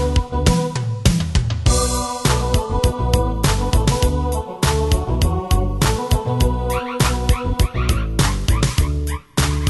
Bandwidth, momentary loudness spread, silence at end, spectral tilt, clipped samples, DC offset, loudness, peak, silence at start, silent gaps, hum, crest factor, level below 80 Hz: 12.5 kHz; 3 LU; 0 s; -5 dB/octave; under 0.1%; under 0.1%; -19 LUFS; 0 dBFS; 0 s; none; none; 16 dB; -22 dBFS